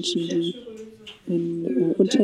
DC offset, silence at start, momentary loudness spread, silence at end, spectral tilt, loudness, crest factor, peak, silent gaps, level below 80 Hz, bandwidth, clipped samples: under 0.1%; 0 s; 19 LU; 0 s; -5.5 dB/octave; -24 LUFS; 18 dB; -6 dBFS; none; -66 dBFS; 11.5 kHz; under 0.1%